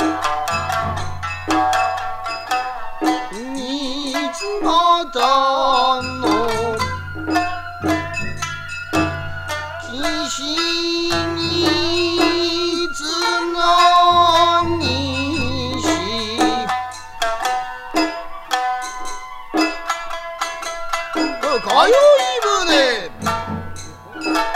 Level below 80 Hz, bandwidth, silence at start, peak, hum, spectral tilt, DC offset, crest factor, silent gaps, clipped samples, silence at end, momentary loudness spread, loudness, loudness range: -40 dBFS; 16 kHz; 0 s; 0 dBFS; none; -3.5 dB/octave; under 0.1%; 18 dB; none; under 0.1%; 0 s; 13 LU; -18 LUFS; 7 LU